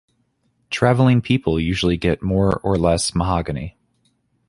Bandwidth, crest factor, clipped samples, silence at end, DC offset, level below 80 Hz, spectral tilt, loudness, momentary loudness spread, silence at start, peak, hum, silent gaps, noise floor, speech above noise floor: 11.5 kHz; 18 dB; under 0.1%; 0.8 s; under 0.1%; -36 dBFS; -6 dB/octave; -19 LUFS; 11 LU; 0.7 s; -2 dBFS; none; none; -66 dBFS; 48 dB